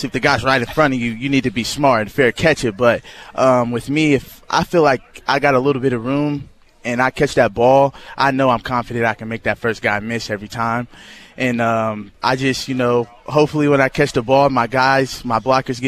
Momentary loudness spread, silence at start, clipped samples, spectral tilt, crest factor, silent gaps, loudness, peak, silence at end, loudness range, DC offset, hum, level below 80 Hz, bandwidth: 7 LU; 0 s; under 0.1%; -5.5 dB/octave; 16 dB; none; -17 LUFS; -2 dBFS; 0 s; 4 LU; under 0.1%; none; -44 dBFS; 14.5 kHz